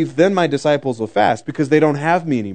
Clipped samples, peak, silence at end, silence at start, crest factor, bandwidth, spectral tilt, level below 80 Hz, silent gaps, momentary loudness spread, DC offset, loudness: under 0.1%; 0 dBFS; 0 s; 0 s; 16 dB; 9.4 kHz; -6.5 dB/octave; -64 dBFS; none; 5 LU; 0.4%; -17 LUFS